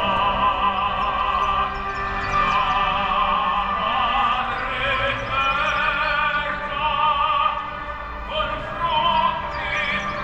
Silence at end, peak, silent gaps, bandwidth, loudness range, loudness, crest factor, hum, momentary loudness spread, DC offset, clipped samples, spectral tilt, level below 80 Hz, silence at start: 0 s; -8 dBFS; none; 8.4 kHz; 1 LU; -21 LUFS; 14 dB; none; 6 LU; under 0.1%; under 0.1%; -4.5 dB/octave; -38 dBFS; 0 s